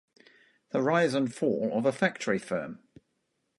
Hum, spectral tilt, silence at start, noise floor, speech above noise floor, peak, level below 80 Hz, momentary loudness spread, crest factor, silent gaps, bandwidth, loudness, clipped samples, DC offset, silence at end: none; -5.5 dB/octave; 0.75 s; -78 dBFS; 50 dB; -10 dBFS; -72 dBFS; 9 LU; 20 dB; none; 11.5 kHz; -28 LUFS; under 0.1%; under 0.1%; 0.85 s